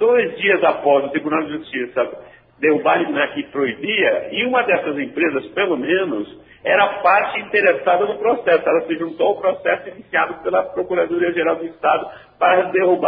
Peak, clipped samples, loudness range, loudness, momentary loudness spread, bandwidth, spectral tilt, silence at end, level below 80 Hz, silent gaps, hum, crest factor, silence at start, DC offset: 0 dBFS; under 0.1%; 3 LU; -18 LUFS; 8 LU; 5 kHz; -9.5 dB/octave; 0 s; -60 dBFS; none; none; 18 dB; 0 s; under 0.1%